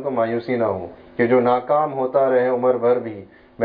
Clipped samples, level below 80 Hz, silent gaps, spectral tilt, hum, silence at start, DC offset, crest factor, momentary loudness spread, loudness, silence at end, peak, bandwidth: under 0.1%; -60 dBFS; none; -10.5 dB/octave; none; 0 s; under 0.1%; 16 dB; 12 LU; -19 LUFS; 0 s; -4 dBFS; 4.9 kHz